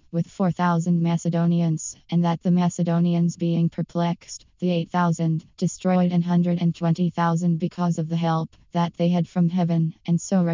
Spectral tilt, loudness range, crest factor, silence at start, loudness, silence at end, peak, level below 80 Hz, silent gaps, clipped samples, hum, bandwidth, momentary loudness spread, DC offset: -7 dB/octave; 1 LU; 12 dB; 0.15 s; -23 LUFS; 0 s; -10 dBFS; -62 dBFS; none; under 0.1%; none; 7.6 kHz; 5 LU; under 0.1%